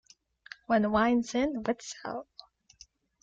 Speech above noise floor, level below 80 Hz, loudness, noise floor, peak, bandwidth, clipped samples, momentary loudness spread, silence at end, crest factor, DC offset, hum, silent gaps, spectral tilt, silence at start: 31 dB; -60 dBFS; -29 LUFS; -59 dBFS; -14 dBFS; 7.8 kHz; under 0.1%; 23 LU; 1 s; 18 dB; under 0.1%; none; none; -5 dB/octave; 0.7 s